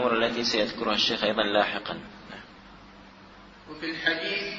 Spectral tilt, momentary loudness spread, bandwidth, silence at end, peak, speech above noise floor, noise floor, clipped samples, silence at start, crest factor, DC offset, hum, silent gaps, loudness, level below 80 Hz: -3.5 dB/octave; 20 LU; 7.8 kHz; 0 s; -8 dBFS; 22 dB; -50 dBFS; under 0.1%; 0 s; 22 dB; under 0.1%; none; none; -26 LUFS; -58 dBFS